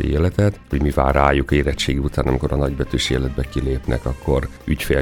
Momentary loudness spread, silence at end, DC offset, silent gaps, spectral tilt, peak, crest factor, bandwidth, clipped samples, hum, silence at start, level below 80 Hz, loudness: 7 LU; 0 s; under 0.1%; none; -6 dB/octave; -2 dBFS; 18 dB; 19 kHz; under 0.1%; none; 0 s; -26 dBFS; -20 LUFS